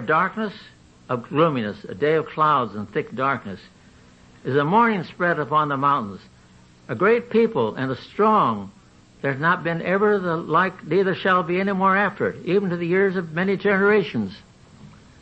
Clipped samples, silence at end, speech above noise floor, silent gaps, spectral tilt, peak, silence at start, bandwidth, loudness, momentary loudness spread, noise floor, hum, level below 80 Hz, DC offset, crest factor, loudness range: under 0.1%; 0.35 s; 30 dB; none; -8 dB/octave; -4 dBFS; 0 s; 8.2 kHz; -21 LUFS; 11 LU; -51 dBFS; none; -60 dBFS; under 0.1%; 18 dB; 3 LU